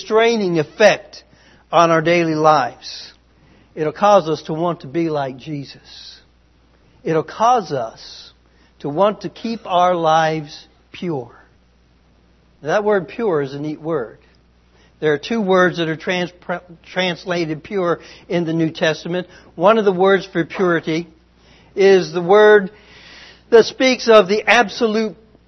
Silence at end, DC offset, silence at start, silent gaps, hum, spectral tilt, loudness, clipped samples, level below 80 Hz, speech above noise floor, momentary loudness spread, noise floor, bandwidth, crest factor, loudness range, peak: 0.35 s; under 0.1%; 0 s; none; none; -5.5 dB/octave; -17 LUFS; under 0.1%; -56 dBFS; 37 dB; 17 LU; -54 dBFS; 6.4 kHz; 18 dB; 9 LU; 0 dBFS